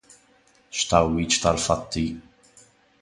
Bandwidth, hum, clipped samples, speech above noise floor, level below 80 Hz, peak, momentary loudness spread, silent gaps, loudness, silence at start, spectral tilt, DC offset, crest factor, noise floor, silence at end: 11.5 kHz; none; under 0.1%; 37 dB; -42 dBFS; -2 dBFS; 11 LU; none; -23 LUFS; 0.75 s; -3.5 dB/octave; under 0.1%; 24 dB; -59 dBFS; 0.8 s